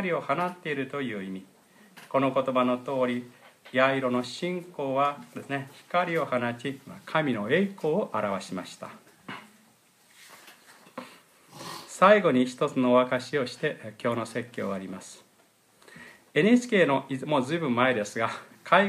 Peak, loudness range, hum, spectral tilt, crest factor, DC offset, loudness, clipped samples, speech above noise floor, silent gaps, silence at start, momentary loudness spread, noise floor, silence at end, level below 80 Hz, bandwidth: -6 dBFS; 9 LU; none; -5.5 dB/octave; 22 dB; under 0.1%; -27 LUFS; under 0.1%; 36 dB; none; 0 s; 20 LU; -63 dBFS; 0 s; -78 dBFS; 15 kHz